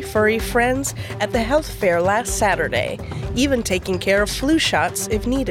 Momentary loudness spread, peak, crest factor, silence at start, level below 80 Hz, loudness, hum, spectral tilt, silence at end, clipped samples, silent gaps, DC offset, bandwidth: 6 LU; -6 dBFS; 14 dB; 0 s; -34 dBFS; -20 LUFS; none; -4 dB/octave; 0 s; under 0.1%; none; under 0.1%; 17.5 kHz